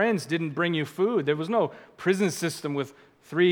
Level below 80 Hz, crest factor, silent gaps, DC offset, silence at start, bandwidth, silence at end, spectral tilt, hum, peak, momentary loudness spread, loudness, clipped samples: -76 dBFS; 18 dB; none; under 0.1%; 0 s; 19 kHz; 0 s; -5.5 dB/octave; none; -8 dBFS; 7 LU; -27 LUFS; under 0.1%